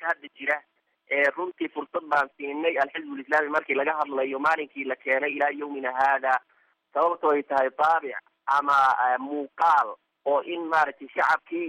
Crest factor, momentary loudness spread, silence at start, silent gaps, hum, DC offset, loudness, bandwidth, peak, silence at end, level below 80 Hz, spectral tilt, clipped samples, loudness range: 16 dB; 10 LU; 0 s; none; none; under 0.1%; -25 LUFS; 12 kHz; -10 dBFS; 0 s; -76 dBFS; -4 dB/octave; under 0.1%; 3 LU